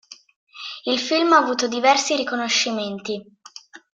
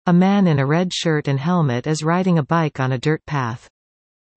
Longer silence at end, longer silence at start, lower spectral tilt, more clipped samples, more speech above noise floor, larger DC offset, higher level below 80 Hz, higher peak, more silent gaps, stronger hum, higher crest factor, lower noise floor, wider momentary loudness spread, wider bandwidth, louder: second, 0.2 s vs 0.8 s; about the same, 0.1 s vs 0.05 s; second, -2 dB/octave vs -6.5 dB/octave; neither; second, 24 dB vs over 72 dB; neither; second, -70 dBFS vs -56 dBFS; first, -2 dBFS vs -6 dBFS; first, 0.36-0.47 s vs none; neither; first, 20 dB vs 14 dB; second, -44 dBFS vs under -90 dBFS; first, 16 LU vs 8 LU; about the same, 9.4 kHz vs 8.6 kHz; about the same, -20 LUFS vs -19 LUFS